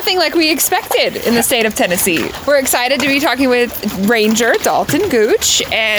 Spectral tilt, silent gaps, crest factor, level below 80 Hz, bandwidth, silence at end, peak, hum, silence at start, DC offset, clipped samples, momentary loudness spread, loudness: -2.5 dB/octave; none; 10 dB; -44 dBFS; over 20 kHz; 0 s; -2 dBFS; none; 0 s; under 0.1%; under 0.1%; 3 LU; -13 LUFS